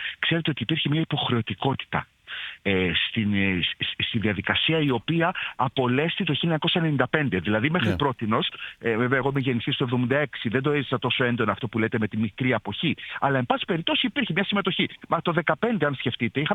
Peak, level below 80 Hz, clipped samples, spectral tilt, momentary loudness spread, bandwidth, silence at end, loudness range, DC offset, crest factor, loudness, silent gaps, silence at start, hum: -4 dBFS; -56 dBFS; under 0.1%; -7.5 dB/octave; 4 LU; 8.8 kHz; 0 s; 2 LU; under 0.1%; 22 dB; -24 LUFS; none; 0 s; none